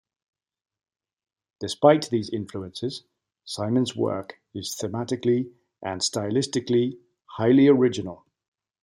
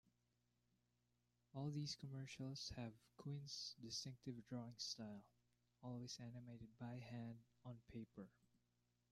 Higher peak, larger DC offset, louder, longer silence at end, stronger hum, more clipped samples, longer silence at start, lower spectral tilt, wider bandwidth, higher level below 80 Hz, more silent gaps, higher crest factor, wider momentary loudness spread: first, -4 dBFS vs -36 dBFS; neither; first, -24 LUFS vs -53 LUFS; about the same, 0.7 s vs 0.8 s; second, none vs 60 Hz at -75 dBFS; neither; about the same, 1.6 s vs 1.55 s; about the same, -5.5 dB/octave vs -4.5 dB/octave; first, 16.5 kHz vs 13.5 kHz; first, -68 dBFS vs -80 dBFS; neither; about the same, 22 dB vs 18 dB; first, 18 LU vs 11 LU